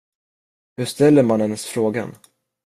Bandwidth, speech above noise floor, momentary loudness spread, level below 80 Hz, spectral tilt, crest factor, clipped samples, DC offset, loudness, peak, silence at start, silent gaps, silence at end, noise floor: 14.5 kHz; over 72 dB; 17 LU; -62 dBFS; -6 dB/octave; 16 dB; under 0.1%; under 0.1%; -19 LUFS; -4 dBFS; 0.8 s; none; 0.55 s; under -90 dBFS